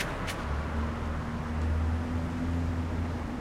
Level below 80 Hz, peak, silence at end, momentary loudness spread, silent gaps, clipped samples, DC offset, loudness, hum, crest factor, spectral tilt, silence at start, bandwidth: -36 dBFS; -18 dBFS; 0 s; 4 LU; none; under 0.1%; under 0.1%; -33 LUFS; none; 12 dB; -6.5 dB/octave; 0 s; 13 kHz